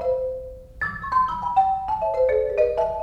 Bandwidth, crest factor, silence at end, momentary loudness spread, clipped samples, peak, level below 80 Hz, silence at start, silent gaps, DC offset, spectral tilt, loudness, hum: 6.6 kHz; 14 dB; 0 s; 9 LU; under 0.1%; -8 dBFS; -44 dBFS; 0 s; none; under 0.1%; -6.5 dB/octave; -23 LUFS; none